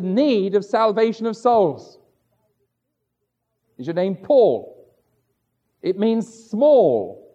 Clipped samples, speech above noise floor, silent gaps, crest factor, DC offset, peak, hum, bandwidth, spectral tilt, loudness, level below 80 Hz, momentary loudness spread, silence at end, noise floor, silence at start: under 0.1%; 58 dB; none; 16 dB; under 0.1%; -6 dBFS; none; 8.6 kHz; -7 dB/octave; -19 LUFS; -72 dBFS; 12 LU; 0.2 s; -76 dBFS; 0 s